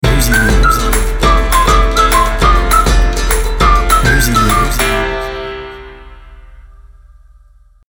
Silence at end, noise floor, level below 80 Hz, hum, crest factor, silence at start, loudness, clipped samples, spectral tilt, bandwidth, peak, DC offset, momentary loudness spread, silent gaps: 1.3 s; -44 dBFS; -14 dBFS; 60 Hz at -40 dBFS; 12 dB; 0.05 s; -11 LUFS; under 0.1%; -4 dB/octave; 19 kHz; 0 dBFS; under 0.1%; 11 LU; none